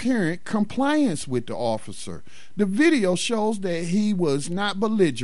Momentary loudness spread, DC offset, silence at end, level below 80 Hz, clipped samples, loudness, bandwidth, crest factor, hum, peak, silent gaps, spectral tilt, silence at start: 12 LU; 2%; 0 s; -60 dBFS; under 0.1%; -23 LUFS; 11.5 kHz; 16 dB; none; -8 dBFS; none; -5.5 dB/octave; 0 s